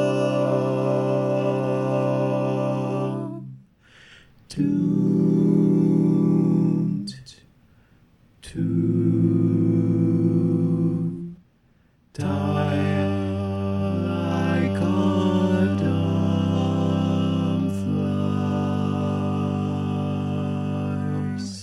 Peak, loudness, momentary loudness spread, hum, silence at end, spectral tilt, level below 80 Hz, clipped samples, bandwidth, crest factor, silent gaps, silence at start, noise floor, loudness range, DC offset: -6 dBFS; -23 LUFS; 8 LU; none; 0 s; -8.5 dB/octave; -58 dBFS; under 0.1%; 11.5 kHz; 16 dB; none; 0 s; -60 dBFS; 4 LU; under 0.1%